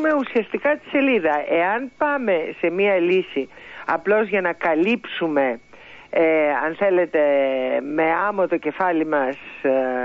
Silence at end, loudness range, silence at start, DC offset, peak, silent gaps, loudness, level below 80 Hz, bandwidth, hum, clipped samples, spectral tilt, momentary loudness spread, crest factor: 0 s; 1 LU; 0 s; under 0.1%; -8 dBFS; none; -20 LUFS; -64 dBFS; 7 kHz; none; under 0.1%; -7 dB/octave; 6 LU; 14 dB